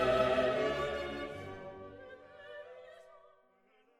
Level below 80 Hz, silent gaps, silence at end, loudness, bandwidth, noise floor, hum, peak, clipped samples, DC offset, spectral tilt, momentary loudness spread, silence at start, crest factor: -58 dBFS; none; 0.8 s; -34 LUFS; 12.5 kHz; -69 dBFS; none; -16 dBFS; under 0.1%; under 0.1%; -5.5 dB/octave; 23 LU; 0 s; 20 dB